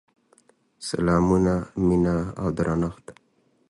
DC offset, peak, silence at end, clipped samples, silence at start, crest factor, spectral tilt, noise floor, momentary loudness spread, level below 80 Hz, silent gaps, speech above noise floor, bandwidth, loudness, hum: under 0.1%; -8 dBFS; 0.6 s; under 0.1%; 0.8 s; 18 dB; -7.5 dB/octave; -65 dBFS; 10 LU; -42 dBFS; none; 43 dB; 11.5 kHz; -23 LUFS; none